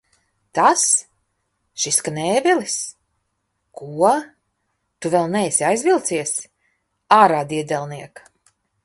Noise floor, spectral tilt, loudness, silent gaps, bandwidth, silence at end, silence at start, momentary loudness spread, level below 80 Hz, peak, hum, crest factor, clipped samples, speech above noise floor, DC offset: -73 dBFS; -3 dB/octave; -18 LUFS; none; 12 kHz; 0.75 s; 0.55 s; 16 LU; -66 dBFS; 0 dBFS; none; 20 dB; under 0.1%; 54 dB; under 0.1%